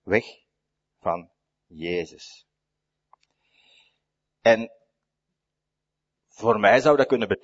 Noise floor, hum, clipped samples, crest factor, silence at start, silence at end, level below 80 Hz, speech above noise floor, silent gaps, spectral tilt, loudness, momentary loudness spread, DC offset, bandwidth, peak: -84 dBFS; none; under 0.1%; 24 dB; 0.05 s; 0.05 s; -64 dBFS; 62 dB; none; -5.5 dB/octave; -22 LUFS; 20 LU; under 0.1%; 8 kHz; -4 dBFS